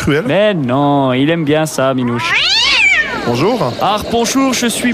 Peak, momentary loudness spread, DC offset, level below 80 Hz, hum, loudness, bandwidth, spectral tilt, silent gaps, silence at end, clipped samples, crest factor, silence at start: -2 dBFS; 6 LU; under 0.1%; -42 dBFS; none; -12 LUFS; 15.5 kHz; -4 dB/octave; none; 0 s; under 0.1%; 12 dB; 0 s